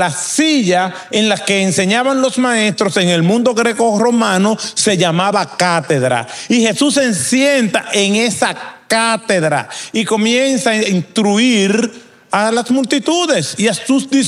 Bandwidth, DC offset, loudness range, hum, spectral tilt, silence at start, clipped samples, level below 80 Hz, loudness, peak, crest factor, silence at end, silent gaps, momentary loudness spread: 15 kHz; under 0.1%; 1 LU; none; -3.5 dB/octave; 0 s; under 0.1%; -62 dBFS; -14 LUFS; 0 dBFS; 14 dB; 0 s; none; 4 LU